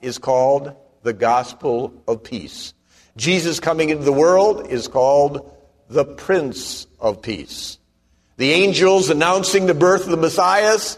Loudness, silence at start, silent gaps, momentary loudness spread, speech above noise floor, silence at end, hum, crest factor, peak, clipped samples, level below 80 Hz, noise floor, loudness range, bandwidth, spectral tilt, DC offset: -17 LUFS; 0 s; none; 15 LU; 43 dB; 0 s; none; 16 dB; -2 dBFS; under 0.1%; -52 dBFS; -61 dBFS; 5 LU; 13.5 kHz; -4 dB/octave; under 0.1%